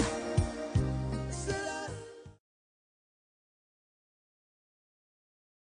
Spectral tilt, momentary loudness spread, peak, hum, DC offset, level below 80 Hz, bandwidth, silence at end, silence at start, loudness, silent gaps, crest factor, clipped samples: -5.5 dB/octave; 13 LU; -16 dBFS; none; under 0.1%; -48 dBFS; 10 kHz; 3.35 s; 0 s; -34 LUFS; none; 22 dB; under 0.1%